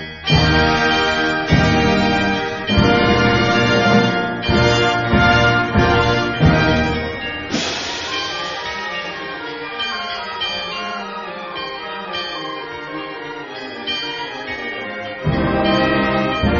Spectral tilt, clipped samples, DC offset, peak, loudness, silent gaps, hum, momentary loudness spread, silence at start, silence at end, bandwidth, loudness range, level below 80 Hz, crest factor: -5.5 dB/octave; under 0.1%; under 0.1%; 0 dBFS; -17 LUFS; none; none; 13 LU; 0 s; 0 s; 7.6 kHz; 11 LU; -32 dBFS; 16 dB